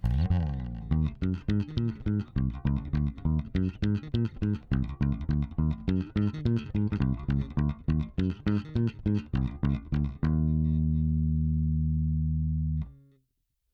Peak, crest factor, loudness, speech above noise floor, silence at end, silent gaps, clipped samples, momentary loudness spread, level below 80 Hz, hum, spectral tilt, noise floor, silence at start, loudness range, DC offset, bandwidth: -12 dBFS; 16 dB; -30 LUFS; 48 dB; 0.8 s; none; under 0.1%; 4 LU; -36 dBFS; none; -10 dB/octave; -78 dBFS; 0 s; 2 LU; under 0.1%; 6.2 kHz